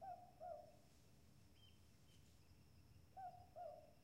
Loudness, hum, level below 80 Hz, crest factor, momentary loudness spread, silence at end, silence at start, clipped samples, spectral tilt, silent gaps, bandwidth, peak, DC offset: -59 LUFS; none; -78 dBFS; 18 dB; 12 LU; 0 s; 0 s; under 0.1%; -5.5 dB/octave; none; 16 kHz; -44 dBFS; under 0.1%